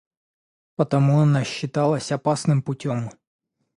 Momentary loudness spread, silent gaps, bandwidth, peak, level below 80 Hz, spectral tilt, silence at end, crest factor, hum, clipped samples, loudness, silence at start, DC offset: 10 LU; none; 11 kHz; -4 dBFS; -62 dBFS; -7 dB/octave; 0.65 s; 18 dB; none; under 0.1%; -22 LUFS; 0.8 s; under 0.1%